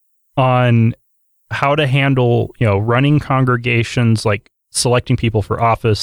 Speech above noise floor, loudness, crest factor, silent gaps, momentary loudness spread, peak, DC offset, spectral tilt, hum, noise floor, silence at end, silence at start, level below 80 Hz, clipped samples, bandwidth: 46 dB; -15 LUFS; 12 dB; none; 6 LU; -2 dBFS; under 0.1%; -6 dB/octave; none; -60 dBFS; 0 s; 0.35 s; -42 dBFS; under 0.1%; 13 kHz